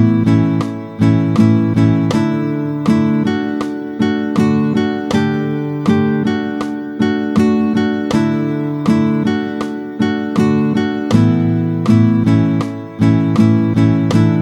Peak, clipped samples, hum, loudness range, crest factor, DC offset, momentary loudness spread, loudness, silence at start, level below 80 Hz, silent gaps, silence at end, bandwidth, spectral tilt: 0 dBFS; under 0.1%; none; 3 LU; 14 dB; under 0.1%; 7 LU; -15 LUFS; 0 s; -50 dBFS; none; 0 s; 10.5 kHz; -8 dB/octave